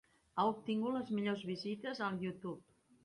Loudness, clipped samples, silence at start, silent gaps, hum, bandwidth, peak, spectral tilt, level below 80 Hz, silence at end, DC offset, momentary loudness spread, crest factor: -39 LUFS; under 0.1%; 0.35 s; none; none; 11 kHz; -22 dBFS; -7 dB/octave; -78 dBFS; 0.45 s; under 0.1%; 10 LU; 18 dB